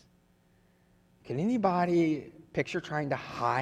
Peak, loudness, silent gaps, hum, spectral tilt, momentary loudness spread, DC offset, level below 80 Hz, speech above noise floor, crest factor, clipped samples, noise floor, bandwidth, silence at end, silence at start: -12 dBFS; -30 LUFS; none; none; -7 dB/octave; 10 LU; under 0.1%; -66 dBFS; 36 dB; 18 dB; under 0.1%; -66 dBFS; 9.6 kHz; 0 s; 1.25 s